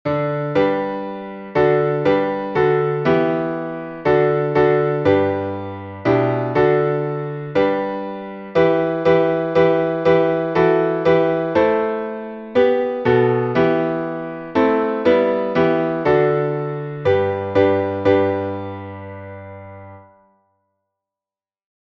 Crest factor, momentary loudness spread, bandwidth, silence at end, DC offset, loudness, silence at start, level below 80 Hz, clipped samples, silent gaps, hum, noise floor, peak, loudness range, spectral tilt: 16 dB; 12 LU; 6.6 kHz; 1.9 s; under 0.1%; -18 LUFS; 0.05 s; -52 dBFS; under 0.1%; none; none; under -90 dBFS; -2 dBFS; 4 LU; -8.5 dB/octave